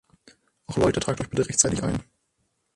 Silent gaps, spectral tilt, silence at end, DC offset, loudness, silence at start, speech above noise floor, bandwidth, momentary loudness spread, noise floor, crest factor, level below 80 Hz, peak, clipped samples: none; -4 dB/octave; 0.75 s; under 0.1%; -24 LUFS; 0.7 s; 49 dB; 11.5 kHz; 10 LU; -73 dBFS; 24 dB; -46 dBFS; -2 dBFS; under 0.1%